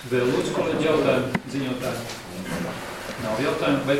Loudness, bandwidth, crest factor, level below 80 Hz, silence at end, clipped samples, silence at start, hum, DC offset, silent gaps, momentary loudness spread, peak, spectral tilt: -25 LUFS; 16.5 kHz; 16 dB; -52 dBFS; 0 s; under 0.1%; 0 s; none; under 0.1%; none; 11 LU; -8 dBFS; -5.5 dB/octave